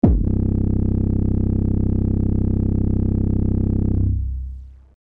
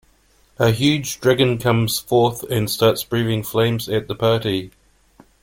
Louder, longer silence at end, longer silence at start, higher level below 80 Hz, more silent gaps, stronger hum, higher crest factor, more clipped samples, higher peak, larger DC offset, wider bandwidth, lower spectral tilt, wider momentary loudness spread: about the same, -20 LUFS vs -19 LUFS; second, 0.3 s vs 0.75 s; second, 0.05 s vs 0.6 s; first, -24 dBFS vs -50 dBFS; neither; neither; about the same, 16 dB vs 18 dB; neither; about the same, -2 dBFS vs -2 dBFS; first, 0.5% vs under 0.1%; second, 2.1 kHz vs 17 kHz; first, -13.5 dB/octave vs -5 dB/octave; about the same, 4 LU vs 6 LU